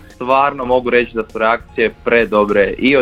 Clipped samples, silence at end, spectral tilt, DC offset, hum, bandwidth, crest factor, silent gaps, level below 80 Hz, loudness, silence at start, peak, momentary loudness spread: under 0.1%; 0 s; -6.5 dB/octave; under 0.1%; none; 7.4 kHz; 14 dB; none; -40 dBFS; -15 LUFS; 0.2 s; 0 dBFS; 5 LU